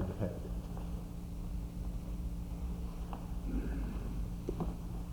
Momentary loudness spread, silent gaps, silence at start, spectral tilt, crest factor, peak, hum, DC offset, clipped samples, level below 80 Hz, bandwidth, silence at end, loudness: 4 LU; none; 0 s; -8 dB/octave; 16 dB; -22 dBFS; none; under 0.1%; under 0.1%; -42 dBFS; over 20 kHz; 0 s; -42 LUFS